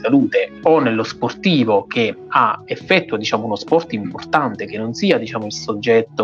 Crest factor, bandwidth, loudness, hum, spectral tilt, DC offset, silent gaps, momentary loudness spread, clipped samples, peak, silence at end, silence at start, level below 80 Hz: 18 dB; 7.4 kHz; -18 LUFS; none; -5.5 dB/octave; under 0.1%; none; 9 LU; under 0.1%; 0 dBFS; 0 s; 0 s; -62 dBFS